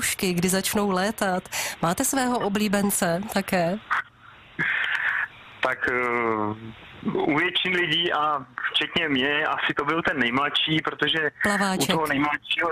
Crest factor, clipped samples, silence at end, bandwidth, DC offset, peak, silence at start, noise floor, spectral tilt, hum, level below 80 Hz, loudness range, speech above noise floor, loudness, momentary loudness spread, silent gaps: 16 dB; under 0.1%; 0 s; 15.5 kHz; under 0.1%; -8 dBFS; 0 s; -50 dBFS; -3 dB/octave; none; -56 dBFS; 3 LU; 25 dB; -24 LUFS; 6 LU; none